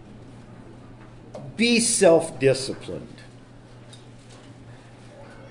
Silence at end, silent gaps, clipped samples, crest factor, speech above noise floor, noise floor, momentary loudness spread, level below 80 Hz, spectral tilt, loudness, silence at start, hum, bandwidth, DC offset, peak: 0 s; none; under 0.1%; 20 dB; 25 dB; -46 dBFS; 28 LU; -54 dBFS; -3.5 dB/octave; -20 LUFS; 0.05 s; none; 11 kHz; under 0.1%; -6 dBFS